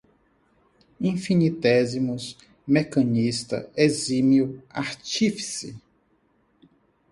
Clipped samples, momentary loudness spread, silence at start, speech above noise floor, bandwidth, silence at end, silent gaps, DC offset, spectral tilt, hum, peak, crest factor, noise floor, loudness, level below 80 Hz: under 0.1%; 11 LU; 1 s; 42 dB; 11.5 kHz; 1.35 s; none; under 0.1%; -5.5 dB/octave; none; -6 dBFS; 20 dB; -65 dBFS; -24 LUFS; -62 dBFS